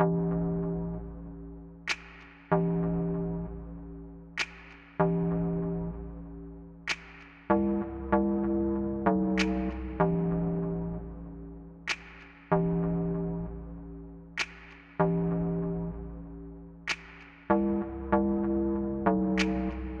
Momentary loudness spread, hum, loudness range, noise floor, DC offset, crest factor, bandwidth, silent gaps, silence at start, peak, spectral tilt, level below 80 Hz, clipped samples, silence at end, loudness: 18 LU; none; 4 LU; -50 dBFS; under 0.1%; 20 dB; 8.2 kHz; none; 0 s; -10 dBFS; -7 dB/octave; -44 dBFS; under 0.1%; 0 s; -31 LUFS